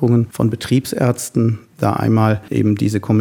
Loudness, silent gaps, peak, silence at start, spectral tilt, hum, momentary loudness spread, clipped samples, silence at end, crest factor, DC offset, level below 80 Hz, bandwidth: -17 LUFS; none; 0 dBFS; 0 s; -7 dB/octave; none; 4 LU; under 0.1%; 0 s; 16 dB; under 0.1%; -50 dBFS; 17.5 kHz